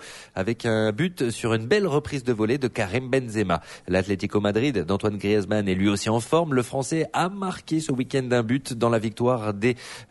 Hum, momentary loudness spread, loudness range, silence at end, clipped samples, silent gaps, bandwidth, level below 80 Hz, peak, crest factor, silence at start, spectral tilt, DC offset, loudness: none; 5 LU; 1 LU; 0.05 s; under 0.1%; none; 11.5 kHz; -54 dBFS; -8 dBFS; 16 dB; 0 s; -6 dB/octave; under 0.1%; -24 LUFS